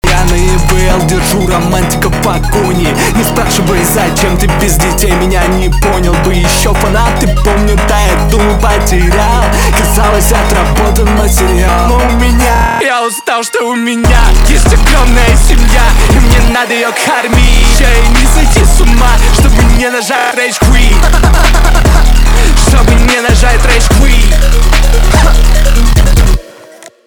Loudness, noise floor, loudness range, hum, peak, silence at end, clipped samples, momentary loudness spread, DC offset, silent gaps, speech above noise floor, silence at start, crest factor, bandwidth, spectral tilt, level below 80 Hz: -9 LUFS; -33 dBFS; 2 LU; none; 0 dBFS; 0.55 s; 0.4%; 3 LU; under 0.1%; none; 27 dB; 0.05 s; 6 dB; 19 kHz; -4.5 dB/octave; -8 dBFS